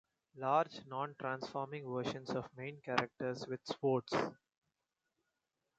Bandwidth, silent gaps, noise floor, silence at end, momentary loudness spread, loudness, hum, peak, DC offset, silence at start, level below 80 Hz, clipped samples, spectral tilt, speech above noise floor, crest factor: 8.8 kHz; none; -88 dBFS; 1.45 s; 9 LU; -39 LUFS; none; -14 dBFS; under 0.1%; 0.35 s; -78 dBFS; under 0.1%; -5.5 dB/octave; 49 dB; 26 dB